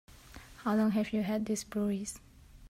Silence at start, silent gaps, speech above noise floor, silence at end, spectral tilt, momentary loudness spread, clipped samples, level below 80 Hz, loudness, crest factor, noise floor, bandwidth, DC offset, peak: 0.1 s; none; 21 dB; 0.05 s; -5.5 dB/octave; 22 LU; under 0.1%; -58 dBFS; -33 LUFS; 14 dB; -52 dBFS; 15.5 kHz; under 0.1%; -20 dBFS